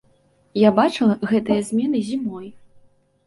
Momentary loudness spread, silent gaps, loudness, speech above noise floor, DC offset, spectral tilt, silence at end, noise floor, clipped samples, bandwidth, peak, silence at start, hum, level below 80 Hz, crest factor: 14 LU; none; -20 LUFS; 40 dB; under 0.1%; -6.5 dB/octave; 0.7 s; -59 dBFS; under 0.1%; 11.5 kHz; -4 dBFS; 0.55 s; none; -60 dBFS; 18 dB